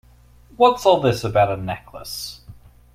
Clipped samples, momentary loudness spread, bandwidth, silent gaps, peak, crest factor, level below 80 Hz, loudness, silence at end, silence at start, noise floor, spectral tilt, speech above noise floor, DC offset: under 0.1%; 16 LU; 16 kHz; none; -2 dBFS; 20 dB; -48 dBFS; -19 LUFS; 0.45 s; 0.6 s; -50 dBFS; -5.5 dB/octave; 31 dB; under 0.1%